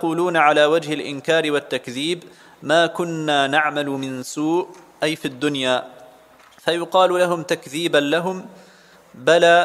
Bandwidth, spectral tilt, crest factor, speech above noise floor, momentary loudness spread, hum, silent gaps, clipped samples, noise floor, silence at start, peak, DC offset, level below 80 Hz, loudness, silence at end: 15 kHz; -4 dB/octave; 18 dB; 30 dB; 11 LU; none; none; under 0.1%; -49 dBFS; 0 s; -2 dBFS; under 0.1%; -70 dBFS; -20 LUFS; 0 s